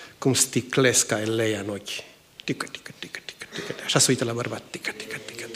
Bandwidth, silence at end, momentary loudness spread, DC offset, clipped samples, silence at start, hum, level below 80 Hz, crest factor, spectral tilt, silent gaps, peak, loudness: 15.5 kHz; 0 s; 17 LU; under 0.1%; under 0.1%; 0 s; none; -66 dBFS; 20 dB; -3 dB/octave; none; -6 dBFS; -24 LUFS